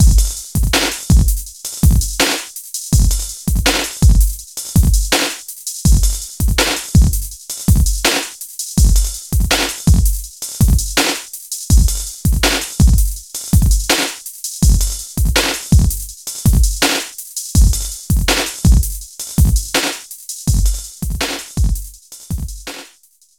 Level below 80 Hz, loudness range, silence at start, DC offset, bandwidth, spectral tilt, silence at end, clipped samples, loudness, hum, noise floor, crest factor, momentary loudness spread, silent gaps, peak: -16 dBFS; 2 LU; 0 s; under 0.1%; 19 kHz; -4 dB/octave; 0.55 s; under 0.1%; -16 LUFS; none; -51 dBFS; 14 dB; 11 LU; none; 0 dBFS